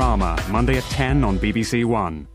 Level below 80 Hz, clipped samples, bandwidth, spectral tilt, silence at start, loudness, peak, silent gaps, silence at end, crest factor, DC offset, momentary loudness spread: -26 dBFS; under 0.1%; 15.5 kHz; -6 dB/octave; 0 s; -21 LUFS; -4 dBFS; none; 0.05 s; 16 dB; under 0.1%; 2 LU